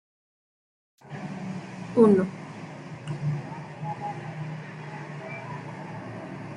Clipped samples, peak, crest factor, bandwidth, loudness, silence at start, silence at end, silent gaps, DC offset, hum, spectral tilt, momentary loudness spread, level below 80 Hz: under 0.1%; -6 dBFS; 24 dB; 10.5 kHz; -29 LUFS; 1 s; 0 s; none; under 0.1%; none; -8.5 dB/octave; 19 LU; -66 dBFS